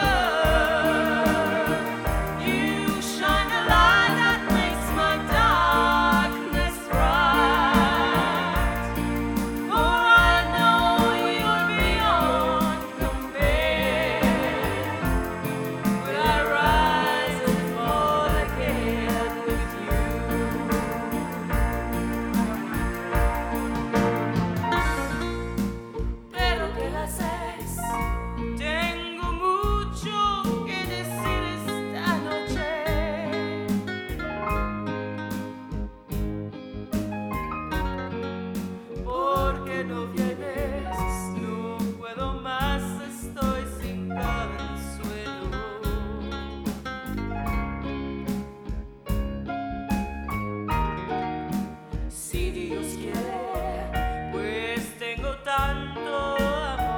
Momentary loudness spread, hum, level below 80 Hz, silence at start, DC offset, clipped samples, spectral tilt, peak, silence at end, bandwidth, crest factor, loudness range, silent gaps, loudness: 12 LU; none; -34 dBFS; 0 s; under 0.1%; under 0.1%; -5 dB/octave; -6 dBFS; 0 s; over 20 kHz; 20 dB; 11 LU; none; -25 LUFS